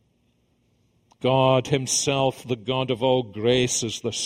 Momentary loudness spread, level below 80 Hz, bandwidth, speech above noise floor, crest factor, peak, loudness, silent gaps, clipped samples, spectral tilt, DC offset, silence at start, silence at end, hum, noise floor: 7 LU; -56 dBFS; 16 kHz; 44 dB; 20 dB; -4 dBFS; -23 LUFS; none; under 0.1%; -4 dB/octave; under 0.1%; 1.2 s; 0 s; 60 Hz at -50 dBFS; -66 dBFS